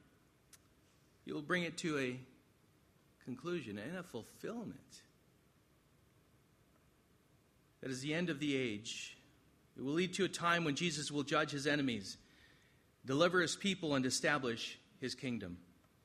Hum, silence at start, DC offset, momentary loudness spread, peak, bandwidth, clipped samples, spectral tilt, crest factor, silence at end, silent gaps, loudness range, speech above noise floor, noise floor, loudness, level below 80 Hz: none; 1.25 s; under 0.1%; 16 LU; -18 dBFS; 14.5 kHz; under 0.1%; -4 dB/octave; 24 dB; 0.4 s; none; 14 LU; 33 dB; -71 dBFS; -38 LUFS; -76 dBFS